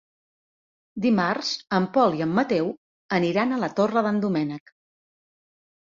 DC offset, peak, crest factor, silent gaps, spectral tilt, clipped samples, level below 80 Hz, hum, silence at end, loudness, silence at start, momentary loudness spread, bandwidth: under 0.1%; -8 dBFS; 18 dB; 2.78-3.09 s; -6 dB/octave; under 0.1%; -66 dBFS; none; 1.3 s; -24 LUFS; 0.95 s; 9 LU; 7.6 kHz